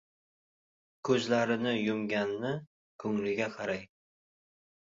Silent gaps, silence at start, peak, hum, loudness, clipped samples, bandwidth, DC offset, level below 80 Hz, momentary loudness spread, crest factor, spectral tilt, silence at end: 2.67-2.99 s; 1.05 s; -12 dBFS; none; -32 LUFS; under 0.1%; 7.6 kHz; under 0.1%; -72 dBFS; 11 LU; 22 dB; -5.5 dB/octave; 1.1 s